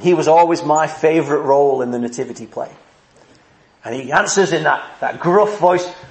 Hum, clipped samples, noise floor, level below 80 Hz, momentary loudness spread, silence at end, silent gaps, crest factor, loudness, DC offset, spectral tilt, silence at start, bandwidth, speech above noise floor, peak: none; under 0.1%; -51 dBFS; -62 dBFS; 16 LU; 0.05 s; none; 16 dB; -16 LUFS; under 0.1%; -4.5 dB/octave; 0 s; 8.8 kHz; 35 dB; 0 dBFS